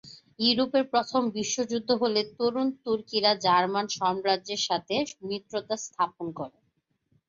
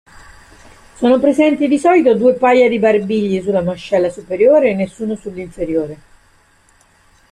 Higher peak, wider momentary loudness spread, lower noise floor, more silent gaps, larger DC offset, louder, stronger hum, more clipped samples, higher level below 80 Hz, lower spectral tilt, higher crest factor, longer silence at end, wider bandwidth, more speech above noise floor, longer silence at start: second, -8 dBFS vs -2 dBFS; about the same, 10 LU vs 12 LU; first, -74 dBFS vs -52 dBFS; neither; neither; second, -27 LUFS vs -14 LUFS; neither; neither; second, -70 dBFS vs -48 dBFS; second, -3 dB/octave vs -6.5 dB/octave; about the same, 18 dB vs 14 dB; second, 0.8 s vs 1.35 s; second, 7.8 kHz vs 10.5 kHz; first, 47 dB vs 39 dB; second, 0.05 s vs 1 s